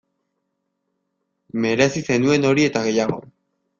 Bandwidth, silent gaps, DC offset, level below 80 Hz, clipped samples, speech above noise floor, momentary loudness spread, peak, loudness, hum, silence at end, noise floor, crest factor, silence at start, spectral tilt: 7.6 kHz; none; under 0.1%; -58 dBFS; under 0.1%; 56 dB; 9 LU; -2 dBFS; -19 LUFS; none; 0.6 s; -75 dBFS; 20 dB; 1.55 s; -5 dB/octave